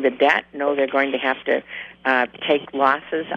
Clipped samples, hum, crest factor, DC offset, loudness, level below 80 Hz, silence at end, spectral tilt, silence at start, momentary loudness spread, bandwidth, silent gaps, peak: under 0.1%; none; 18 dB; under 0.1%; -20 LUFS; -64 dBFS; 0 s; -5 dB/octave; 0 s; 5 LU; 7.6 kHz; none; -2 dBFS